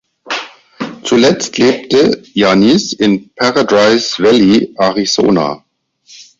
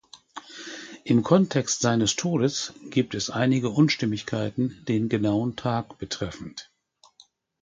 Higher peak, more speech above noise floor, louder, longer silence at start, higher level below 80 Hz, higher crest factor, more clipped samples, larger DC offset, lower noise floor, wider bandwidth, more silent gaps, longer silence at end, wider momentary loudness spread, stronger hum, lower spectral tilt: first, 0 dBFS vs -4 dBFS; about the same, 35 dB vs 37 dB; first, -11 LUFS vs -25 LUFS; about the same, 0.25 s vs 0.15 s; first, -48 dBFS vs -58 dBFS; second, 12 dB vs 22 dB; neither; neither; second, -46 dBFS vs -61 dBFS; second, 7.8 kHz vs 9.6 kHz; neither; second, 0.2 s vs 1 s; second, 12 LU vs 17 LU; neither; about the same, -4.5 dB/octave vs -5 dB/octave